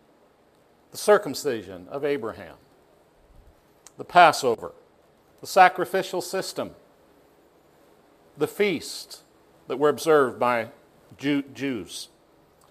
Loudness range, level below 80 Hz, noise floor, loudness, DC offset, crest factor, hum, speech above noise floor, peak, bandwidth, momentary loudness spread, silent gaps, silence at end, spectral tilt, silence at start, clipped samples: 8 LU; -66 dBFS; -60 dBFS; -23 LUFS; under 0.1%; 26 dB; none; 36 dB; 0 dBFS; 15.5 kHz; 23 LU; none; 0.65 s; -4 dB/octave; 0.95 s; under 0.1%